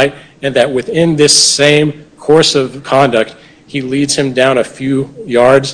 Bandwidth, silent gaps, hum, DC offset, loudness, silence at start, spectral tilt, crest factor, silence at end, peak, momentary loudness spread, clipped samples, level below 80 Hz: 11 kHz; none; none; under 0.1%; -11 LUFS; 0 s; -3.5 dB/octave; 12 dB; 0 s; 0 dBFS; 11 LU; 1%; -48 dBFS